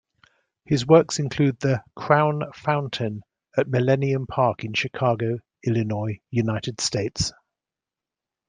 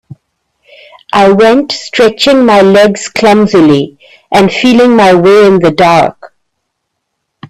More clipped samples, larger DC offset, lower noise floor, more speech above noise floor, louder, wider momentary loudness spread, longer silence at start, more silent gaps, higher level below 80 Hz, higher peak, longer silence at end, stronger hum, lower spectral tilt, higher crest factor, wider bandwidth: second, under 0.1% vs 0.2%; neither; first, -89 dBFS vs -68 dBFS; about the same, 66 dB vs 63 dB; second, -23 LUFS vs -6 LUFS; first, 10 LU vs 7 LU; second, 0.7 s vs 1.15 s; neither; second, -54 dBFS vs -44 dBFS; about the same, -2 dBFS vs 0 dBFS; first, 1.2 s vs 0.05 s; neither; about the same, -5.5 dB/octave vs -5.5 dB/octave; first, 22 dB vs 8 dB; second, 9.8 kHz vs 14 kHz